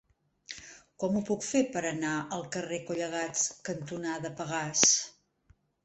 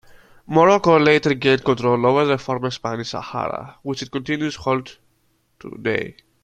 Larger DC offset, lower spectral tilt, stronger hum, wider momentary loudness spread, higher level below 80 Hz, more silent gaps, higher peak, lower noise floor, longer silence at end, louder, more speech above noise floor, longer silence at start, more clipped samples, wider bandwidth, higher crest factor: neither; second, -2.5 dB/octave vs -6 dB/octave; neither; first, 21 LU vs 13 LU; second, -68 dBFS vs -54 dBFS; neither; second, -4 dBFS vs 0 dBFS; about the same, -66 dBFS vs -64 dBFS; first, 0.75 s vs 0.3 s; second, -30 LUFS vs -19 LUFS; second, 35 dB vs 45 dB; about the same, 0.5 s vs 0.5 s; neither; about the same, 8.6 kHz vs 9.2 kHz; first, 30 dB vs 20 dB